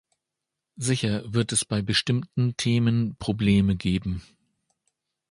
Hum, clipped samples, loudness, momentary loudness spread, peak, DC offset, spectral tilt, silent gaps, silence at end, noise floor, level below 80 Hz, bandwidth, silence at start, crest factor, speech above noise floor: none; under 0.1%; -25 LUFS; 7 LU; -8 dBFS; under 0.1%; -5 dB/octave; none; 1.1 s; -85 dBFS; -46 dBFS; 11.5 kHz; 0.8 s; 18 dB; 61 dB